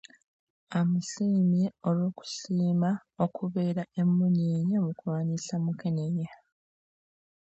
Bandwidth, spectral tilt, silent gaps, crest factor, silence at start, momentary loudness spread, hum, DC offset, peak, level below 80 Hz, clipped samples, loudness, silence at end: 8 kHz; -7.5 dB/octave; none; 16 dB; 0.7 s; 7 LU; none; under 0.1%; -14 dBFS; -74 dBFS; under 0.1%; -29 LUFS; 1.1 s